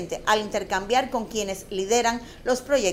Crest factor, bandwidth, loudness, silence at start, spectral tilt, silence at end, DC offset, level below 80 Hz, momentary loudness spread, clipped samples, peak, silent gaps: 18 dB; 16 kHz; -25 LUFS; 0 s; -2.5 dB/octave; 0 s; under 0.1%; -48 dBFS; 7 LU; under 0.1%; -6 dBFS; none